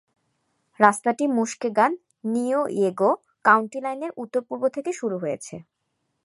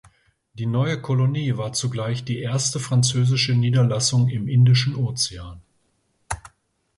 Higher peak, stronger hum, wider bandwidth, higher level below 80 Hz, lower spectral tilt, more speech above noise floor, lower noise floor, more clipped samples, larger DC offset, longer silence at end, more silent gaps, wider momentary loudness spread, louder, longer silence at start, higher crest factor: first, 0 dBFS vs -8 dBFS; neither; about the same, 11.5 kHz vs 11.5 kHz; second, -74 dBFS vs -50 dBFS; about the same, -5 dB/octave vs -5 dB/octave; first, 53 dB vs 47 dB; first, -76 dBFS vs -68 dBFS; neither; neither; first, 0.65 s vs 0.5 s; neither; second, 11 LU vs 14 LU; about the same, -23 LUFS vs -21 LUFS; first, 0.8 s vs 0.55 s; first, 24 dB vs 14 dB